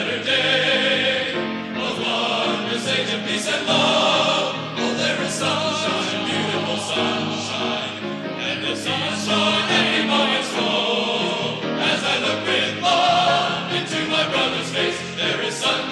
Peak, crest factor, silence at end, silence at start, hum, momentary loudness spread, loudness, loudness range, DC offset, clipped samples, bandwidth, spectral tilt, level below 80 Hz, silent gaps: -6 dBFS; 16 dB; 0 s; 0 s; none; 7 LU; -20 LUFS; 3 LU; under 0.1%; under 0.1%; 13 kHz; -3 dB/octave; -64 dBFS; none